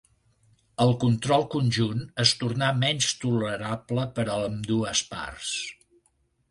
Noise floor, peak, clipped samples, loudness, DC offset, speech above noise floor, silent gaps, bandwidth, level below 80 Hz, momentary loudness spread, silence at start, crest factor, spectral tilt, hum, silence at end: -69 dBFS; -4 dBFS; under 0.1%; -26 LUFS; under 0.1%; 44 dB; none; 11.5 kHz; -56 dBFS; 9 LU; 0.8 s; 22 dB; -4.5 dB/octave; none; 0.8 s